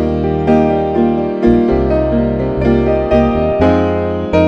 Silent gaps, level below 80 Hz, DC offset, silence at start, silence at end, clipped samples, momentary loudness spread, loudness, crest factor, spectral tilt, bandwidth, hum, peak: none; -26 dBFS; under 0.1%; 0 s; 0 s; under 0.1%; 3 LU; -13 LUFS; 12 dB; -9 dB/octave; 6.8 kHz; none; 0 dBFS